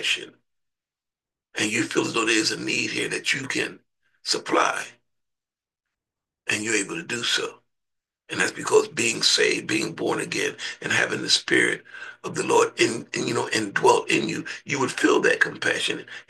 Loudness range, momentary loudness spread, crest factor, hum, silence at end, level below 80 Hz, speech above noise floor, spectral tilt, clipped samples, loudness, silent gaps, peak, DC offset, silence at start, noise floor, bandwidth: 6 LU; 12 LU; 20 dB; none; 0.1 s; -70 dBFS; over 66 dB; -2.5 dB/octave; under 0.1%; -23 LUFS; none; -4 dBFS; under 0.1%; 0 s; under -90 dBFS; 12.5 kHz